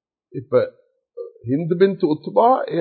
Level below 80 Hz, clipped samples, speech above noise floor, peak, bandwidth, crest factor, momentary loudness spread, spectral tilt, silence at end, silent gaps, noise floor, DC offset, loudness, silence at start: -64 dBFS; under 0.1%; 19 dB; -2 dBFS; 4.5 kHz; 18 dB; 19 LU; -12 dB/octave; 0 s; none; -37 dBFS; under 0.1%; -19 LUFS; 0.35 s